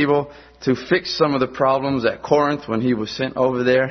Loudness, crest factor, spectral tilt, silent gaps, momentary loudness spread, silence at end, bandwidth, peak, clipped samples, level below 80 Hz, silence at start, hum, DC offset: -20 LUFS; 18 dB; -6 dB/octave; none; 5 LU; 0 s; 6.4 kHz; -2 dBFS; under 0.1%; -52 dBFS; 0 s; none; under 0.1%